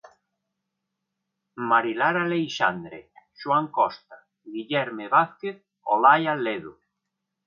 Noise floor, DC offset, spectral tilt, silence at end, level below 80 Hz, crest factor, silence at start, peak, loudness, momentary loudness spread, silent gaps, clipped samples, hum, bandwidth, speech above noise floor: -82 dBFS; under 0.1%; -5.5 dB/octave; 0.75 s; -74 dBFS; 22 dB; 1.55 s; -4 dBFS; -23 LUFS; 18 LU; none; under 0.1%; none; 7.2 kHz; 58 dB